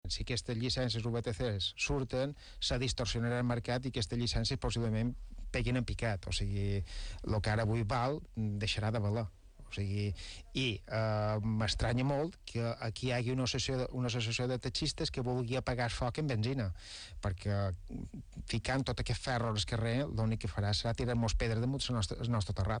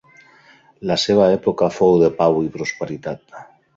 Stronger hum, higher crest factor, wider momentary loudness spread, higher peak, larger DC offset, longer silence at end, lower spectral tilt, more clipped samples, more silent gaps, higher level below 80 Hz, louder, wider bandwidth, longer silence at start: neither; about the same, 14 dB vs 16 dB; second, 6 LU vs 15 LU; second, -20 dBFS vs -2 dBFS; neither; second, 0 s vs 0.35 s; about the same, -5.5 dB/octave vs -5.5 dB/octave; neither; neither; first, -46 dBFS vs -52 dBFS; second, -35 LUFS vs -18 LUFS; first, 10.5 kHz vs 7.8 kHz; second, 0.05 s vs 0.8 s